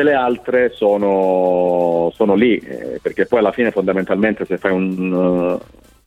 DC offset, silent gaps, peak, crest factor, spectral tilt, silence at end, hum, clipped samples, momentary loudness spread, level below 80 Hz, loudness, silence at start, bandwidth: under 0.1%; none; -2 dBFS; 14 dB; -8 dB/octave; 0.45 s; none; under 0.1%; 6 LU; -50 dBFS; -17 LUFS; 0 s; 9.4 kHz